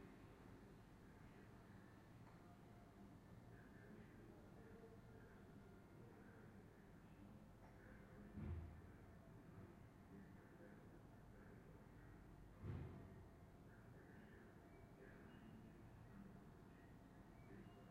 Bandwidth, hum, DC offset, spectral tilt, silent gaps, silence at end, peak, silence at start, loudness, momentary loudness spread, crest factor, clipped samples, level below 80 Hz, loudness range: 15 kHz; none; under 0.1%; -7.5 dB/octave; none; 0 s; -40 dBFS; 0 s; -63 LUFS; 7 LU; 22 dB; under 0.1%; -70 dBFS; 4 LU